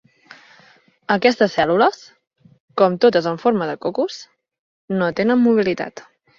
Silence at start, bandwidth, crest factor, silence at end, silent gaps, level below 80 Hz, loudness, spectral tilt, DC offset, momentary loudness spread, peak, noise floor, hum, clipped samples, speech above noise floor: 1.1 s; 7.4 kHz; 18 dB; 0.35 s; 2.60-2.68 s, 4.59-4.88 s; -60 dBFS; -18 LUFS; -6 dB/octave; under 0.1%; 14 LU; -2 dBFS; -53 dBFS; none; under 0.1%; 35 dB